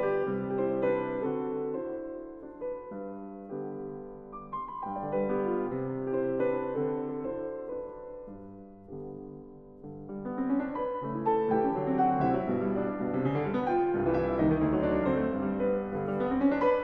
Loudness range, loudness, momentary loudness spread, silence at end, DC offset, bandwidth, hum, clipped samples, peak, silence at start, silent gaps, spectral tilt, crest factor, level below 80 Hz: 10 LU; -31 LUFS; 17 LU; 0 s; under 0.1%; 5 kHz; none; under 0.1%; -14 dBFS; 0 s; none; -10.5 dB/octave; 16 dB; -54 dBFS